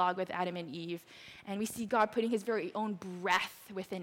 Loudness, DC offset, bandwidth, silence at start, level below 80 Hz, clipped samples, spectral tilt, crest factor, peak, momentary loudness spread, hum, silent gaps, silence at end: -35 LUFS; under 0.1%; 17 kHz; 0 s; -74 dBFS; under 0.1%; -4.5 dB/octave; 18 dB; -16 dBFS; 12 LU; none; none; 0 s